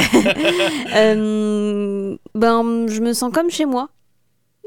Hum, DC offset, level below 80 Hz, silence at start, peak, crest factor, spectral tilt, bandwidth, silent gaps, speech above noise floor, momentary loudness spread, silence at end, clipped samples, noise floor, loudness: none; under 0.1%; -50 dBFS; 0 s; -4 dBFS; 14 dB; -4 dB/octave; 18 kHz; none; 50 dB; 9 LU; 0.8 s; under 0.1%; -67 dBFS; -18 LUFS